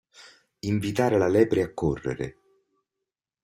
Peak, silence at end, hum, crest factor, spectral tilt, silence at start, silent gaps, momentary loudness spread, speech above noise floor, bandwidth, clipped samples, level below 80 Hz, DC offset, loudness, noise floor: -8 dBFS; 1.15 s; none; 20 dB; -7 dB/octave; 0.2 s; none; 14 LU; 62 dB; 15.5 kHz; under 0.1%; -52 dBFS; under 0.1%; -25 LUFS; -86 dBFS